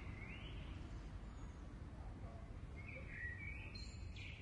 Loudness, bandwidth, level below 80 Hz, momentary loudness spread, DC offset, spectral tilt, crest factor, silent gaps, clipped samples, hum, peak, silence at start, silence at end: -52 LUFS; 11 kHz; -54 dBFS; 6 LU; under 0.1%; -5.5 dB/octave; 14 dB; none; under 0.1%; none; -36 dBFS; 0 s; 0 s